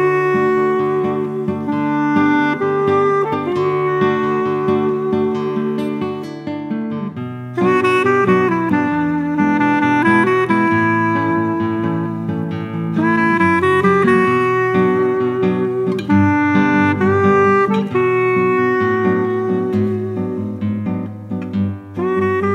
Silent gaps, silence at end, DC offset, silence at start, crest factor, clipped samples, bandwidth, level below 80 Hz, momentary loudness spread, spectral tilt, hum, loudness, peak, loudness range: none; 0 s; under 0.1%; 0 s; 14 dB; under 0.1%; 10 kHz; -56 dBFS; 9 LU; -8 dB/octave; none; -16 LUFS; -2 dBFS; 4 LU